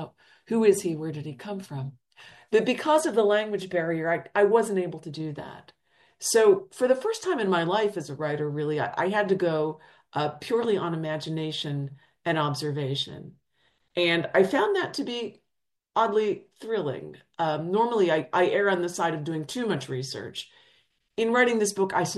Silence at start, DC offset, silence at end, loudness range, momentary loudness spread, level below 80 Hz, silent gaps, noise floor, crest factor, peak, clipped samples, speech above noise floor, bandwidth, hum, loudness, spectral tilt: 0 s; under 0.1%; 0 s; 4 LU; 13 LU; -72 dBFS; none; -82 dBFS; 18 dB; -8 dBFS; under 0.1%; 56 dB; 12.5 kHz; none; -26 LUFS; -4.5 dB/octave